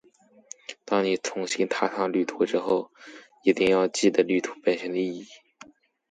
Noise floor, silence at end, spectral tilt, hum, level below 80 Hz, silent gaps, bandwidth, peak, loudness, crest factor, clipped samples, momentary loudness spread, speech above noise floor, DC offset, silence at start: -53 dBFS; 0.75 s; -4 dB/octave; none; -70 dBFS; none; 9.6 kHz; -8 dBFS; -25 LUFS; 20 dB; under 0.1%; 19 LU; 28 dB; under 0.1%; 0.7 s